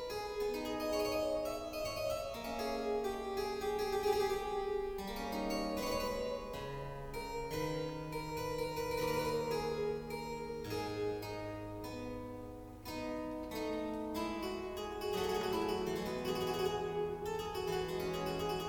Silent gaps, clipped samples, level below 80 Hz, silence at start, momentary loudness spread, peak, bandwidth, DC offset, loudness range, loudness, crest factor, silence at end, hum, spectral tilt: none; under 0.1%; -54 dBFS; 0 s; 8 LU; -22 dBFS; 19 kHz; under 0.1%; 5 LU; -39 LUFS; 16 dB; 0 s; none; -5 dB/octave